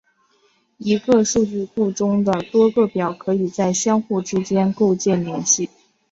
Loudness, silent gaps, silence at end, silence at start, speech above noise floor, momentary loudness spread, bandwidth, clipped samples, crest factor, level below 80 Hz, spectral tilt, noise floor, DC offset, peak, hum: -19 LUFS; none; 0.45 s; 0.8 s; 43 dB; 6 LU; 8 kHz; under 0.1%; 16 dB; -56 dBFS; -5 dB/octave; -61 dBFS; under 0.1%; -2 dBFS; none